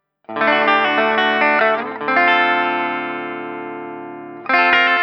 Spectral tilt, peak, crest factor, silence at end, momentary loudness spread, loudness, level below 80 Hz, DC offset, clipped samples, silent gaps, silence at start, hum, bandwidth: -5 dB/octave; 0 dBFS; 18 dB; 0 s; 17 LU; -15 LUFS; -68 dBFS; under 0.1%; under 0.1%; none; 0.3 s; none; 6.6 kHz